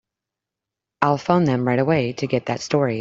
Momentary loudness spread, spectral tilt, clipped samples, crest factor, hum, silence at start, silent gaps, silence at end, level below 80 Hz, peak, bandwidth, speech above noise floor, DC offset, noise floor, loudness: 5 LU; -6.5 dB/octave; under 0.1%; 20 dB; none; 1 s; none; 0 s; -58 dBFS; 0 dBFS; 7.8 kHz; 66 dB; under 0.1%; -86 dBFS; -21 LUFS